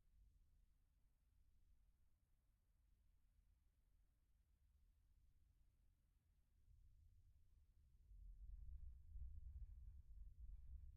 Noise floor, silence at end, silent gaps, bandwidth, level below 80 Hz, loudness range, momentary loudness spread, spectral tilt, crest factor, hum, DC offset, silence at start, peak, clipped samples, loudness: -82 dBFS; 0 s; none; 1 kHz; -64 dBFS; 5 LU; 5 LU; -20 dB/octave; 16 dB; none; under 0.1%; 0.05 s; -48 dBFS; under 0.1%; -64 LUFS